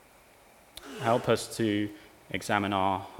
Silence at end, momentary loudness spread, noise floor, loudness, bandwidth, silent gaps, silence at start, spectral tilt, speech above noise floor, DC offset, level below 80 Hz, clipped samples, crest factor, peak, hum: 0 s; 20 LU; -57 dBFS; -29 LUFS; 18 kHz; none; 0.75 s; -5 dB/octave; 29 dB; under 0.1%; -64 dBFS; under 0.1%; 22 dB; -8 dBFS; none